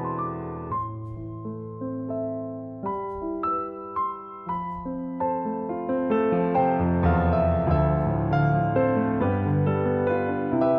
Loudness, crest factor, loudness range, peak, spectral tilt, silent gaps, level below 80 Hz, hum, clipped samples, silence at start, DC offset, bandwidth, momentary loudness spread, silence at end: -26 LUFS; 16 dB; 9 LU; -10 dBFS; -11.5 dB/octave; none; -42 dBFS; none; under 0.1%; 0 s; under 0.1%; 5.4 kHz; 11 LU; 0 s